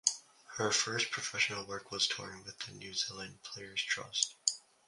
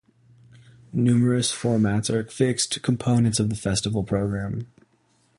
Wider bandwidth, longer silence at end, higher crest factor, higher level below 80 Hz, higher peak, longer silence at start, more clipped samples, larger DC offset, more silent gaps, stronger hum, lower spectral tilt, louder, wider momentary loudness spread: about the same, 11.5 kHz vs 11.5 kHz; second, 0.3 s vs 0.75 s; first, 30 dB vs 16 dB; second, -74 dBFS vs -48 dBFS; about the same, -8 dBFS vs -8 dBFS; second, 0.05 s vs 0.95 s; neither; neither; neither; neither; second, -0.5 dB/octave vs -5.5 dB/octave; second, -35 LUFS vs -23 LUFS; first, 14 LU vs 9 LU